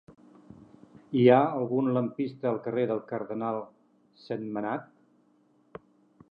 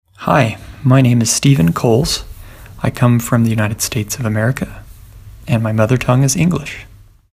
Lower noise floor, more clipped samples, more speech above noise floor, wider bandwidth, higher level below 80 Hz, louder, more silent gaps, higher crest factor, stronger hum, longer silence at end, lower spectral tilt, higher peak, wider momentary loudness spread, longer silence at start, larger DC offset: first, -65 dBFS vs -36 dBFS; neither; first, 38 dB vs 23 dB; second, 5.2 kHz vs 15.5 kHz; second, -74 dBFS vs -36 dBFS; second, -28 LUFS vs -15 LUFS; neither; first, 22 dB vs 14 dB; neither; first, 1.5 s vs 0.5 s; first, -10 dB/octave vs -5.5 dB/octave; second, -8 dBFS vs 0 dBFS; first, 28 LU vs 10 LU; about the same, 0.1 s vs 0.2 s; neither